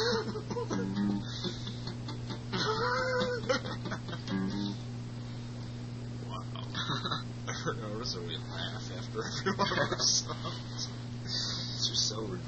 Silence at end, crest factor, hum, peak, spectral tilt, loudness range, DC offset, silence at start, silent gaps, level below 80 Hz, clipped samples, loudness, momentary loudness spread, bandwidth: 0 s; 20 dB; none; -14 dBFS; -4 dB/octave; 6 LU; under 0.1%; 0 s; none; -54 dBFS; under 0.1%; -34 LUFS; 11 LU; 8.4 kHz